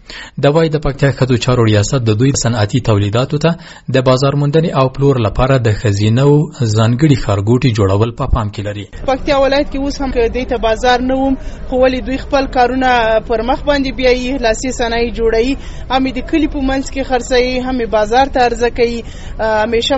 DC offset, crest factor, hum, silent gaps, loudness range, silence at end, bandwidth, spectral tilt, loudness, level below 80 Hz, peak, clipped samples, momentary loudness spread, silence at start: under 0.1%; 14 dB; none; none; 3 LU; 0 s; 8.2 kHz; -6 dB/octave; -14 LUFS; -26 dBFS; 0 dBFS; under 0.1%; 6 LU; 0.1 s